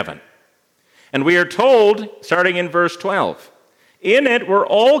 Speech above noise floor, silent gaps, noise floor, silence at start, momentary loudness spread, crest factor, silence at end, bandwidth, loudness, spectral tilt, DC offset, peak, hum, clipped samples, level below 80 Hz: 45 dB; none; -60 dBFS; 0 s; 10 LU; 16 dB; 0 s; 14 kHz; -16 LUFS; -5 dB/octave; under 0.1%; 0 dBFS; none; under 0.1%; -70 dBFS